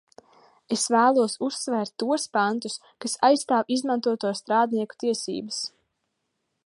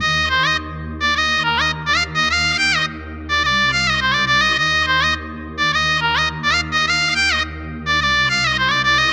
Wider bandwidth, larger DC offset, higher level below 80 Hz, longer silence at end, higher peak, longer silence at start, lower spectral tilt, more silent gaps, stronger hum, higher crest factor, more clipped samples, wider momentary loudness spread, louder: second, 11.5 kHz vs over 20 kHz; neither; second, -78 dBFS vs -36 dBFS; first, 1 s vs 0 s; about the same, -6 dBFS vs -4 dBFS; first, 0.7 s vs 0 s; about the same, -3 dB/octave vs -2.5 dB/octave; neither; neither; first, 20 dB vs 14 dB; neither; first, 11 LU vs 6 LU; second, -25 LUFS vs -16 LUFS